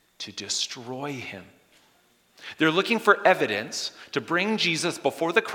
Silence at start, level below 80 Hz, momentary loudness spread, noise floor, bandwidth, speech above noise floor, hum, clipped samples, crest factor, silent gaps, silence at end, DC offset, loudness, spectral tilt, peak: 0.2 s; -78 dBFS; 16 LU; -63 dBFS; 18.5 kHz; 37 dB; none; under 0.1%; 24 dB; none; 0 s; under 0.1%; -25 LUFS; -3 dB/octave; -2 dBFS